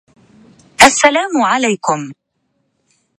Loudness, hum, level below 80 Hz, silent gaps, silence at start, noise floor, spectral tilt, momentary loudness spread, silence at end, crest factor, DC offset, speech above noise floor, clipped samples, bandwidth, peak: -12 LUFS; none; -50 dBFS; none; 0.8 s; -66 dBFS; -2 dB/octave; 18 LU; 1.05 s; 16 dB; under 0.1%; 52 dB; 0.5%; 16 kHz; 0 dBFS